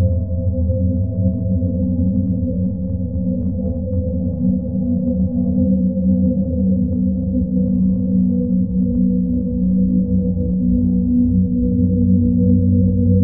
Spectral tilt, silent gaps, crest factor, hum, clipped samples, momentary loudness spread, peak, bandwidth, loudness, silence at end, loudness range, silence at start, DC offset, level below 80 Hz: -19.5 dB/octave; none; 14 dB; none; under 0.1%; 6 LU; -4 dBFS; 0.9 kHz; -18 LUFS; 0 s; 4 LU; 0 s; 1%; -28 dBFS